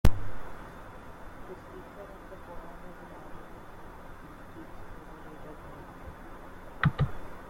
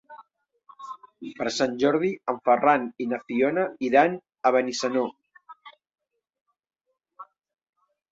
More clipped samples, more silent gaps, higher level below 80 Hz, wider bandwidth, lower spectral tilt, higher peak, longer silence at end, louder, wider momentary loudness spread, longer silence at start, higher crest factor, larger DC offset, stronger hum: neither; second, none vs 6.41-6.45 s; first, -42 dBFS vs -72 dBFS; first, 16.5 kHz vs 8 kHz; first, -7 dB/octave vs -4.5 dB/octave; about the same, -6 dBFS vs -6 dBFS; second, 0 s vs 0.9 s; second, -40 LUFS vs -24 LUFS; about the same, 18 LU vs 20 LU; about the same, 0.05 s vs 0.1 s; first, 26 dB vs 20 dB; neither; neither